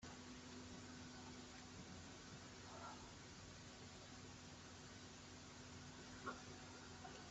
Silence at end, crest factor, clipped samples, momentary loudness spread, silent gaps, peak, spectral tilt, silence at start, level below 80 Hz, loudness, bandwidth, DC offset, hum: 0 s; 22 dB; under 0.1%; 4 LU; none; -36 dBFS; -3.5 dB/octave; 0 s; -72 dBFS; -57 LUFS; 8.2 kHz; under 0.1%; none